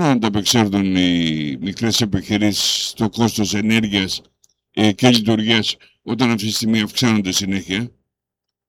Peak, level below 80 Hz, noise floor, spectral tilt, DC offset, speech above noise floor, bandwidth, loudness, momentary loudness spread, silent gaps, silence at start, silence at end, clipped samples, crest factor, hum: 0 dBFS; -48 dBFS; -83 dBFS; -4 dB/octave; under 0.1%; 65 dB; 17 kHz; -17 LUFS; 8 LU; none; 0 s; 0.8 s; under 0.1%; 18 dB; none